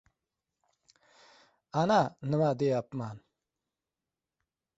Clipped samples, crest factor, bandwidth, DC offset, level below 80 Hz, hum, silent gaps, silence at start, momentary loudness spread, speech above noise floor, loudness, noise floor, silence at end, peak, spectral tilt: under 0.1%; 22 dB; 8 kHz; under 0.1%; -70 dBFS; none; none; 1.75 s; 14 LU; over 61 dB; -30 LUFS; under -90 dBFS; 1.6 s; -12 dBFS; -7 dB/octave